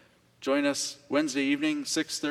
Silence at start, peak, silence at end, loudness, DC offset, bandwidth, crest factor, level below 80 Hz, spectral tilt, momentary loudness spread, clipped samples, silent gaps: 0.4 s; -12 dBFS; 0 s; -28 LUFS; under 0.1%; 14.5 kHz; 16 dB; -76 dBFS; -2.5 dB/octave; 3 LU; under 0.1%; none